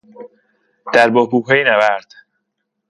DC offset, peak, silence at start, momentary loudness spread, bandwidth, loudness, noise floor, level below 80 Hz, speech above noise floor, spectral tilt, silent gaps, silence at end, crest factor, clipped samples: under 0.1%; 0 dBFS; 0.2 s; 10 LU; 11.5 kHz; -14 LUFS; -74 dBFS; -66 dBFS; 59 dB; -5 dB/octave; none; 0.9 s; 16 dB; under 0.1%